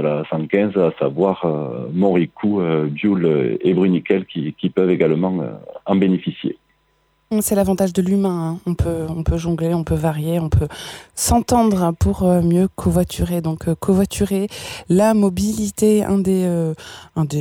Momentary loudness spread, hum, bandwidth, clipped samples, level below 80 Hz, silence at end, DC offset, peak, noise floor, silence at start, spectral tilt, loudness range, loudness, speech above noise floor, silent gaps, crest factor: 9 LU; none; 17 kHz; under 0.1%; -34 dBFS; 0 s; under 0.1%; -2 dBFS; -62 dBFS; 0 s; -6.5 dB/octave; 3 LU; -19 LUFS; 45 dB; none; 16 dB